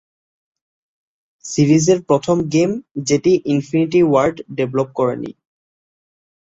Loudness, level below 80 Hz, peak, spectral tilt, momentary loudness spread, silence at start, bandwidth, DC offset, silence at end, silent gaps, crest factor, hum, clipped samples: -17 LUFS; -54 dBFS; -2 dBFS; -6 dB/octave; 10 LU; 1.45 s; 8 kHz; under 0.1%; 1.25 s; 2.91-2.95 s; 16 dB; none; under 0.1%